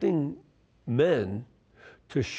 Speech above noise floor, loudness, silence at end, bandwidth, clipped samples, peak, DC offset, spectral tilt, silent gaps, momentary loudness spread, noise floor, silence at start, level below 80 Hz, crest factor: 28 dB; -29 LUFS; 0 s; 8.4 kHz; under 0.1%; -12 dBFS; under 0.1%; -7 dB/octave; none; 18 LU; -55 dBFS; 0 s; -62 dBFS; 16 dB